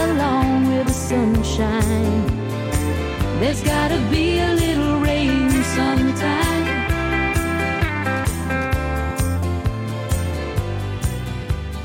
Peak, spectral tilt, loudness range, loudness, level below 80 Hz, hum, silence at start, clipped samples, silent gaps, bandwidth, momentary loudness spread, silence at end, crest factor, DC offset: -6 dBFS; -5.5 dB/octave; 4 LU; -20 LUFS; -28 dBFS; none; 0 s; under 0.1%; none; 17 kHz; 6 LU; 0 s; 14 dB; under 0.1%